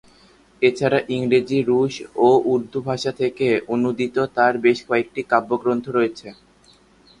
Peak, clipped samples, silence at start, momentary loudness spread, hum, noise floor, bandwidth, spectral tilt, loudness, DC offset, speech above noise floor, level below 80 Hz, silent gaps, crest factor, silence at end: -2 dBFS; under 0.1%; 0.6 s; 7 LU; none; -54 dBFS; 10.5 kHz; -6 dB/octave; -20 LUFS; under 0.1%; 34 dB; -60 dBFS; none; 18 dB; 0.85 s